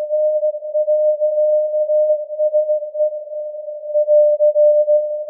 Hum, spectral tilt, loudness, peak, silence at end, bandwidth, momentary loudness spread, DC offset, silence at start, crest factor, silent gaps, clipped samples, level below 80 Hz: none; -8.5 dB/octave; -16 LUFS; -6 dBFS; 0 s; 0.7 kHz; 10 LU; under 0.1%; 0 s; 10 dB; none; under 0.1%; under -90 dBFS